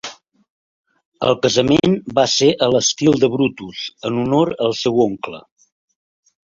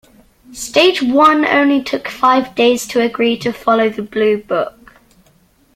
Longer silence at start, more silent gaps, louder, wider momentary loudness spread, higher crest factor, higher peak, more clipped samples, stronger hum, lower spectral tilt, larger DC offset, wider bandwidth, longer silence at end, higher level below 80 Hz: second, 0.05 s vs 0.5 s; first, 0.50-0.84 s, 1.05-1.12 s vs none; second, -17 LUFS vs -14 LUFS; first, 14 LU vs 9 LU; about the same, 18 dB vs 16 dB; about the same, 0 dBFS vs 0 dBFS; neither; neither; about the same, -4.5 dB/octave vs -3.5 dB/octave; neither; second, 7.6 kHz vs 16 kHz; about the same, 1.1 s vs 1.05 s; about the same, -52 dBFS vs -52 dBFS